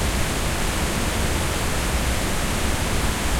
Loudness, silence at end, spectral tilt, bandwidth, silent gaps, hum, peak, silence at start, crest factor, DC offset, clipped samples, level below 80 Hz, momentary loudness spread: -23 LUFS; 0 s; -3.5 dB/octave; 16.5 kHz; none; none; -8 dBFS; 0 s; 14 dB; under 0.1%; under 0.1%; -26 dBFS; 1 LU